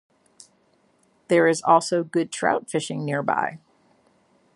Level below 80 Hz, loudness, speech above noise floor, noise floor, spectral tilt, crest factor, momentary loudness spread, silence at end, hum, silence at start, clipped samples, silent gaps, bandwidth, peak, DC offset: -72 dBFS; -22 LUFS; 41 dB; -63 dBFS; -5 dB/octave; 20 dB; 8 LU; 1 s; none; 1.3 s; under 0.1%; none; 11.5 kHz; -4 dBFS; under 0.1%